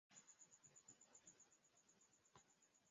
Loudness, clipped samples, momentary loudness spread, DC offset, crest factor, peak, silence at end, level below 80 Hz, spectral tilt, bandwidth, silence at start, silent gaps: -67 LUFS; under 0.1%; 1 LU; under 0.1%; 20 dB; -52 dBFS; 0 s; under -90 dBFS; -2.5 dB/octave; 7.6 kHz; 0.1 s; none